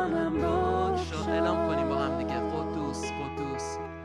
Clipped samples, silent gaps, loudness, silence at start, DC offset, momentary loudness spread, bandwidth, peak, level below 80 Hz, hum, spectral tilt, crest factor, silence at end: under 0.1%; none; -30 LUFS; 0 s; under 0.1%; 7 LU; 11.5 kHz; -14 dBFS; -44 dBFS; none; -6 dB/octave; 16 dB; 0 s